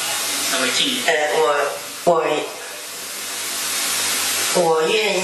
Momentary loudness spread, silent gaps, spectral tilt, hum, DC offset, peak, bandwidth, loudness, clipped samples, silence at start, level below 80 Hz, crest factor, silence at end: 10 LU; none; -1 dB/octave; none; under 0.1%; 0 dBFS; 14 kHz; -19 LUFS; under 0.1%; 0 s; -74 dBFS; 20 dB; 0 s